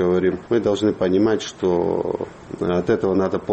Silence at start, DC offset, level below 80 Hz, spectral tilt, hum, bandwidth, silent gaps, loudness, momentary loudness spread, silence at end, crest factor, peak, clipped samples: 0 s; under 0.1%; -50 dBFS; -6.5 dB/octave; none; 8.4 kHz; none; -21 LUFS; 7 LU; 0 s; 14 dB; -6 dBFS; under 0.1%